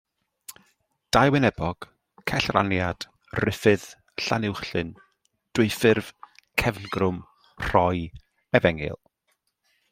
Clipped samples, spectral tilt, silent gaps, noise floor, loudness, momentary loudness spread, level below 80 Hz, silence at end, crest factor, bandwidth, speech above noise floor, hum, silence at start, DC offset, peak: under 0.1%; -5.5 dB/octave; none; -73 dBFS; -24 LUFS; 18 LU; -48 dBFS; 0.95 s; 24 dB; 16 kHz; 50 dB; none; 0.5 s; under 0.1%; -2 dBFS